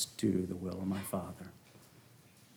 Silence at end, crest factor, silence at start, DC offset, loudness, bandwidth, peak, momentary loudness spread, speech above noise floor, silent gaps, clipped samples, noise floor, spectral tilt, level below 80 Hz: 0.1 s; 20 dB; 0 s; under 0.1%; -37 LUFS; over 20 kHz; -20 dBFS; 25 LU; 25 dB; none; under 0.1%; -61 dBFS; -5.5 dB/octave; -68 dBFS